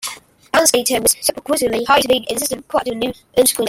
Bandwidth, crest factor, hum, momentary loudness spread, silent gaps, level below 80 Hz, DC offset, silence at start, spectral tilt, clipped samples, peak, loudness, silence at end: 16.5 kHz; 18 dB; none; 7 LU; none; -48 dBFS; under 0.1%; 0 s; -1.5 dB/octave; under 0.1%; 0 dBFS; -16 LUFS; 0 s